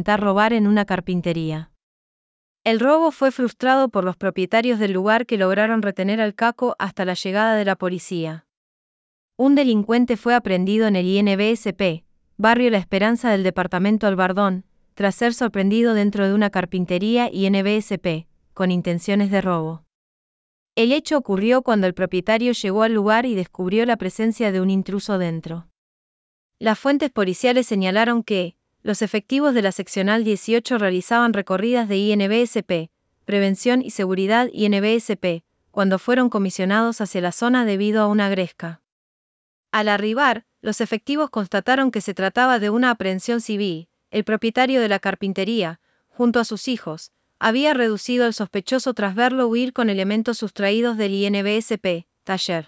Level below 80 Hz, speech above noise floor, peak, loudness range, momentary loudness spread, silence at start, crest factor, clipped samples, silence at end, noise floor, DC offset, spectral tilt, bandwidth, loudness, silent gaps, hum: -58 dBFS; over 71 dB; -4 dBFS; 3 LU; 8 LU; 0 s; 18 dB; under 0.1%; 0.05 s; under -90 dBFS; under 0.1%; -6 dB/octave; 8 kHz; -20 LUFS; 1.83-2.55 s, 8.57-9.29 s, 19.95-20.66 s, 25.78-26.49 s, 38.92-39.63 s; none